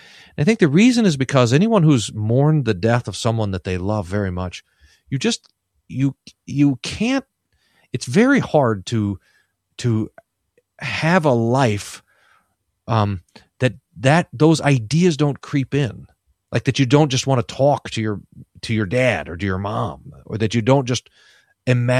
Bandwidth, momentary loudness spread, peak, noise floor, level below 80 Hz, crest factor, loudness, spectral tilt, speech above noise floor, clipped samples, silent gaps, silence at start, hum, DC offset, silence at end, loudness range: 13 kHz; 13 LU; 0 dBFS; -67 dBFS; -50 dBFS; 18 dB; -19 LUFS; -6 dB/octave; 49 dB; under 0.1%; none; 0.4 s; none; under 0.1%; 0 s; 5 LU